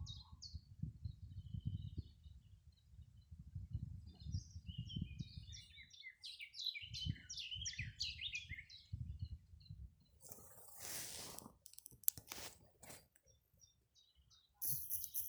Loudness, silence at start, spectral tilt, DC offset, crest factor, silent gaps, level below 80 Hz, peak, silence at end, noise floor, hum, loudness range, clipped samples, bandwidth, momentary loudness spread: -48 LUFS; 0 s; -2.5 dB/octave; under 0.1%; 42 dB; none; -60 dBFS; -8 dBFS; 0 s; -75 dBFS; none; 7 LU; under 0.1%; over 20 kHz; 20 LU